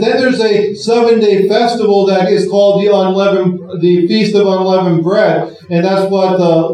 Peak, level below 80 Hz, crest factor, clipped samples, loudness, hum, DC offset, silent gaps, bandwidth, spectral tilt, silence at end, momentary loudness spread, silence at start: 0 dBFS; -66 dBFS; 10 dB; under 0.1%; -11 LUFS; none; under 0.1%; none; 10.5 kHz; -6.5 dB/octave; 0 s; 4 LU; 0 s